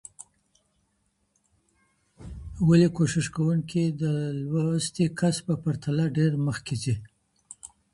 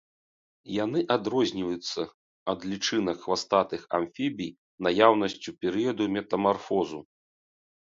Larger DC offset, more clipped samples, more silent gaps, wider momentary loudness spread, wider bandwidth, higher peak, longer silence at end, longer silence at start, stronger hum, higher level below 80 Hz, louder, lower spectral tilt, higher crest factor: neither; neither; second, none vs 2.14-2.46 s, 4.58-4.78 s; first, 21 LU vs 12 LU; first, 11.5 kHz vs 7.8 kHz; second, -8 dBFS vs -4 dBFS; second, 0.3 s vs 0.95 s; second, 0.2 s vs 0.65 s; neither; first, -52 dBFS vs -64 dBFS; about the same, -26 LUFS vs -28 LUFS; first, -6.5 dB/octave vs -4.5 dB/octave; second, 18 dB vs 24 dB